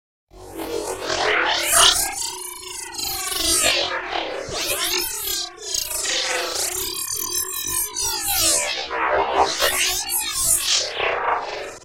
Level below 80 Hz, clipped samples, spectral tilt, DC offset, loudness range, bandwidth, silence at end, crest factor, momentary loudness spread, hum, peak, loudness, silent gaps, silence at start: -46 dBFS; under 0.1%; 0 dB/octave; under 0.1%; 4 LU; 17 kHz; 0 s; 22 dB; 11 LU; none; -2 dBFS; -20 LUFS; none; 0.35 s